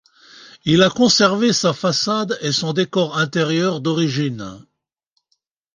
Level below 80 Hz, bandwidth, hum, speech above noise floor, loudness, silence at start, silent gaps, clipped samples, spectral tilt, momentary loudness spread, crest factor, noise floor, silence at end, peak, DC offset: -58 dBFS; 10 kHz; none; 54 dB; -17 LUFS; 0.35 s; none; under 0.1%; -4.5 dB/octave; 9 LU; 18 dB; -72 dBFS; 1.15 s; -2 dBFS; under 0.1%